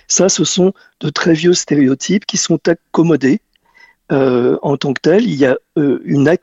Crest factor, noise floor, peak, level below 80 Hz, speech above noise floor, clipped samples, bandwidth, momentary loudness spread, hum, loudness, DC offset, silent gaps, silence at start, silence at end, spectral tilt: 14 dB; -48 dBFS; 0 dBFS; -54 dBFS; 35 dB; under 0.1%; 8.2 kHz; 4 LU; none; -14 LUFS; under 0.1%; none; 0.1 s; 0.05 s; -4.5 dB/octave